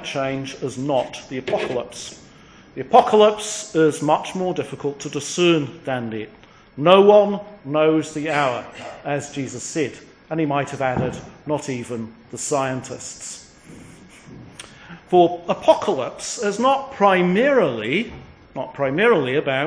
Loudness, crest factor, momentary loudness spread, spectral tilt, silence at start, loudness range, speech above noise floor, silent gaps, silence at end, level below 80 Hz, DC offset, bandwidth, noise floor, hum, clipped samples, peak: -20 LUFS; 20 dB; 17 LU; -4.5 dB/octave; 0 s; 7 LU; 27 dB; none; 0 s; -56 dBFS; under 0.1%; 10.5 kHz; -47 dBFS; none; under 0.1%; 0 dBFS